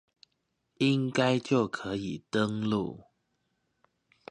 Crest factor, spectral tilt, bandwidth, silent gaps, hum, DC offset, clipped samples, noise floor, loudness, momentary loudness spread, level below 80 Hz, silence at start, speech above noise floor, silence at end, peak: 20 dB; -6 dB/octave; 10.5 kHz; none; none; under 0.1%; under 0.1%; -79 dBFS; -29 LUFS; 9 LU; -64 dBFS; 0.8 s; 50 dB; 1.3 s; -12 dBFS